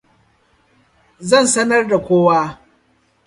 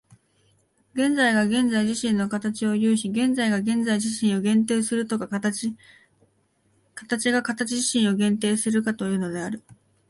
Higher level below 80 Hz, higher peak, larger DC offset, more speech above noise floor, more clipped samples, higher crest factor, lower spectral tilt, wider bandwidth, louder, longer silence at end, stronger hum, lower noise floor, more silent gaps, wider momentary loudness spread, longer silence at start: first, -56 dBFS vs -66 dBFS; first, 0 dBFS vs -8 dBFS; neither; about the same, 45 dB vs 43 dB; neither; about the same, 18 dB vs 16 dB; about the same, -4 dB/octave vs -4.5 dB/octave; about the same, 11.5 kHz vs 11.5 kHz; first, -15 LUFS vs -23 LUFS; first, 0.7 s vs 0.35 s; neither; second, -59 dBFS vs -66 dBFS; neither; about the same, 9 LU vs 9 LU; first, 1.2 s vs 0.95 s